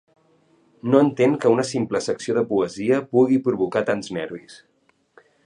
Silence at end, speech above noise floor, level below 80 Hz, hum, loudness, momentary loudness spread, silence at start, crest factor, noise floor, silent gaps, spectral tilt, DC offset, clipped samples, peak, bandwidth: 0.9 s; 39 dB; -64 dBFS; none; -21 LUFS; 12 LU; 0.85 s; 20 dB; -60 dBFS; none; -6 dB/octave; under 0.1%; under 0.1%; -2 dBFS; 10.5 kHz